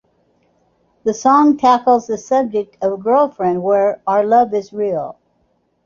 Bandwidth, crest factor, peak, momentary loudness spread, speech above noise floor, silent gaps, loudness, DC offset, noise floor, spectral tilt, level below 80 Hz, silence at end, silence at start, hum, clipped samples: 7.4 kHz; 14 dB; -2 dBFS; 9 LU; 48 dB; none; -15 LUFS; under 0.1%; -62 dBFS; -6 dB/octave; -60 dBFS; 0.75 s; 1.05 s; none; under 0.1%